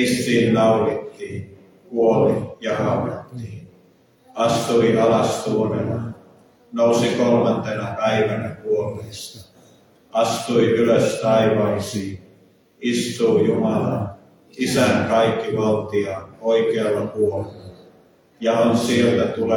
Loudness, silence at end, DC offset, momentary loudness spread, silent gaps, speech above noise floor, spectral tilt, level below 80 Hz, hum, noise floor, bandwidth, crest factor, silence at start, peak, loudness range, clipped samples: -20 LUFS; 0 s; under 0.1%; 15 LU; none; 36 dB; -5.5 dB/octave; -56 dBFS; none; -55 dBFS; 18.5 kHz; 14 dB; 0 s; -6 dBFS; 3 LU; under 0.1%